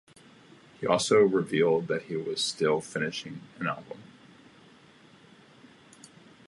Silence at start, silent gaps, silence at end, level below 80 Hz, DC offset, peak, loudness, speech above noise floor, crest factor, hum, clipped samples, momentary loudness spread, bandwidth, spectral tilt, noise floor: 0.8 s; none; 2.45 s; -72 dBFS; under 0.1%; -8 dBFS; -27 LUFS; 29 dB; 22 dB; none; under 0.1%; 16 LU; 11.5 kHz; -4.5 dB/octave; -56 dBFS